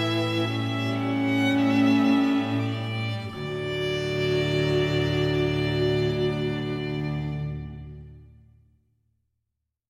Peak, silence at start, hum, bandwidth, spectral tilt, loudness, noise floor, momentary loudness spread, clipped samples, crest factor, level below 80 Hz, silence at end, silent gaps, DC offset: -10 dBFS; 0 s; none; 14 kHz; -7 dB/octave; -25 LUFS; -82 dBFS; 11 LU; under 0.1%; 14 dB; -48 dBFS; 1.65 s; none; under 0.1%